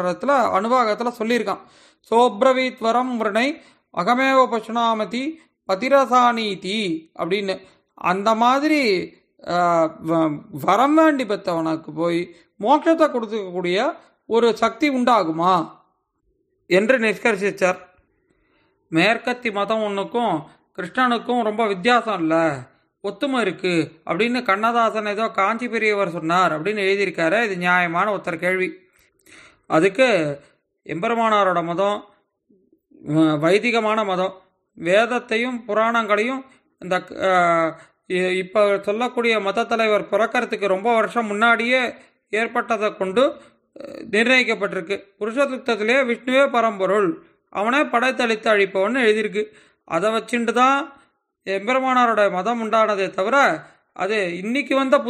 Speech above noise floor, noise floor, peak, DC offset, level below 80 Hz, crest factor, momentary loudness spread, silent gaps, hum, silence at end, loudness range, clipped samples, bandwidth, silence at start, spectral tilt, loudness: 49 dB; -69 dBFS; -4 dBFS; under 0.1%; -68 dBFS; 16 dB; 10 LU; none; none; 0 s; 2 LU; under 0.1%; 14.5 kHz; 0 s; -5 dB/octave; -20 LUFS